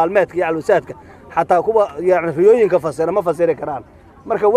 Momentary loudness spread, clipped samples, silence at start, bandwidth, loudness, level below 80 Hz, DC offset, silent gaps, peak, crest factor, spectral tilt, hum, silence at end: 11 LU; under 0.1%; 0 s; 12.5 kHz; -16 LUFS; -52 dBFS; under 0.1%; none; 0 dBFS; 16 dB; -7 dB/octave; none; 0 s